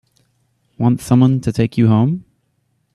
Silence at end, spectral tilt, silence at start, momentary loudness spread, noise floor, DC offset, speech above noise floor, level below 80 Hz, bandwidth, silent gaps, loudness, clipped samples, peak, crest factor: 0.75 s; -8 dB/octave; 0.8 s; 6 LU; -65 dBFS; under 0.1%; 51 dB; -48 dBFS; 13 kHz; none; -15 LUFS; under 0.1%; -2 dBFS; 16 dB